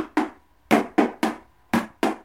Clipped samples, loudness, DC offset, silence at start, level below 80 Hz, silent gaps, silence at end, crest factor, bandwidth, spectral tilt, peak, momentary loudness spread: under 0.1%; -24 LUFS; under 0.1%; 0 s; -60 dBFS; none; 0.05 s; 20 dB; 16.5 kHz; -5 dB/octave; -4 dBFS; 9 LU